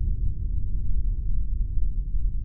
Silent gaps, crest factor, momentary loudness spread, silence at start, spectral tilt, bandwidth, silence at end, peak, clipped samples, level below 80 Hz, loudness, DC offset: none; 10 dB; 1 LU; 0 s; -16.5 dB/octave; 0.5 kHz; 0 s; -12 dBFS; under 0.1%; -26 dBFS; -31 LUFS; under 0.1%